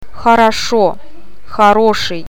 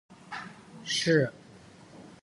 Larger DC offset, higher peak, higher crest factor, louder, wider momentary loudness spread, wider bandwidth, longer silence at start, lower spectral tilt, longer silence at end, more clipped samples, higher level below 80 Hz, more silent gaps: first, 9% vs under 0.1%; first, 0 dBFS vs -12 dBFS; second, 14 dB vs 22 dB; first, -11 LUFS vs -27 LUFS; second, 6 LU vs 24 LU; first, 18 kHz vs 11.5 kHz; about the same, 0.1 s vs 0.1 s; about the same, -4 dB/octave vs -4.5 dB/octave; about the same, 0.05 s vs 0.05 s; first, 0.2% vs under 0.1%; first, -40 dBFS vs -70 dBFS; neither